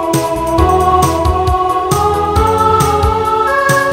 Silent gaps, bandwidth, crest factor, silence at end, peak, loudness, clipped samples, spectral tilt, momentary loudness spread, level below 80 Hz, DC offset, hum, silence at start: none; 16.5 kHz; 12 dB; 0 s; 0 dBFS; -12 LUFS; under 0.1%; -5 dB/octave; 3 LU; -22 dBFS; under 0.1%; none; 0 s